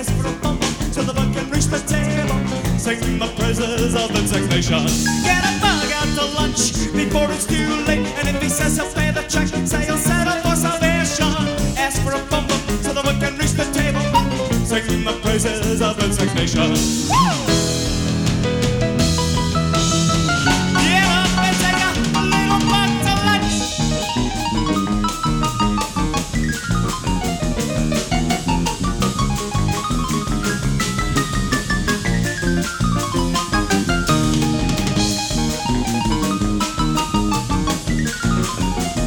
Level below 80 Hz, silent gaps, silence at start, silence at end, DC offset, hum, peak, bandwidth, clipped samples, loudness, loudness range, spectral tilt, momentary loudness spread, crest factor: -28 dBFS; none; 0 s; 0 s; under 0.1%; none; -2 dBFS; 19.5 kHz; under 0.1%; -18 LUFS; 4 LU; -4 dB/octave; 5 LU; 16 dB